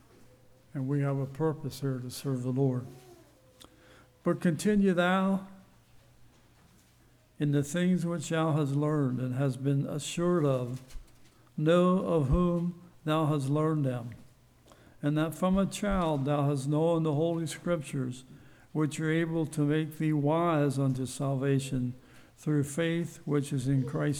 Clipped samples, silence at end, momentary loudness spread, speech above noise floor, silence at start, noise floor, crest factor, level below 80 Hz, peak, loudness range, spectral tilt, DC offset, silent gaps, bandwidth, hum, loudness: under 0.1%; 0 s; 9 LU; 33 dB; 0.75 s; -62 dBFS; 16 dB; -50 dBFS; -14 dBFS; 4 LU; -7 dB/octave; under 0.1%; none; 15 kHz; none; -30 LUFS